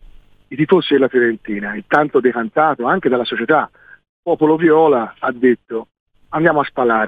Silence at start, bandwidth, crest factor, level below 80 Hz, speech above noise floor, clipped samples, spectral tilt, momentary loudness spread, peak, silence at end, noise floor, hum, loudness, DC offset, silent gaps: 0.5 s; 4.9 kHz; 16 dB; -54 dBFS; 27 dB; under 0.1%; -8 dB/octave; 11 LU; 0 dBFS; 0 s; -42 dBFS; none; -16 LUFS; under 0.1%; 4.09-4.23 s, 6.00-6.06 s